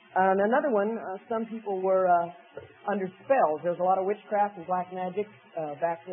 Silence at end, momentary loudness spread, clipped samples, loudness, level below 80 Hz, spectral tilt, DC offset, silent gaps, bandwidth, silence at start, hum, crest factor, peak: 0 s; 13 LU; under 0.1%; -28 LUFS; -80 dBFS; -10.5 dB/octave; under 0.1%; none; 3.6 kHz; 0.15 s; none; 16 dB; -10 dBFS